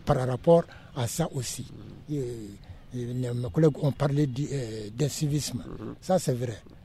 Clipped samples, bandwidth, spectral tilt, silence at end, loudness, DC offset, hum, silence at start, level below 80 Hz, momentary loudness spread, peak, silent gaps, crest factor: under 0.1%; 15 kHz; -6.5 dB/octave; 0.05 s; -28 LUFS; under 0.1%; none; 0 s; -50 dBFS; 16 LU; -8 dBFS; none; 20 dB